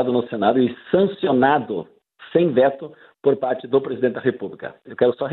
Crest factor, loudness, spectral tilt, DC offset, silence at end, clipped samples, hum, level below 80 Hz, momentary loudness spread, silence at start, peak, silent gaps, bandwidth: 18 dB; -20 LUFS; -10.5 dB/octave; under 0.1%; 0 s; under 0.1%; none; -62 dBFS; 14 LU; 0 s; -4 dBFS; none; 4.2 kHz